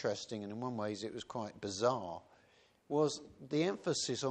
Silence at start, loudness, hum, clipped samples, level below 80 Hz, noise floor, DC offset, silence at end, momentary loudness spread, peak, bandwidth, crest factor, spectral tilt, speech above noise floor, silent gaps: 0 s; -38 LUFS; none; under 0.1%; -76 dBFS; -69 dBFS; under 0.1%; 0 s; 9 LU; -18 dBFS; 10 kHz; 20 dB; -4.5 dB/octave; 31 dB; none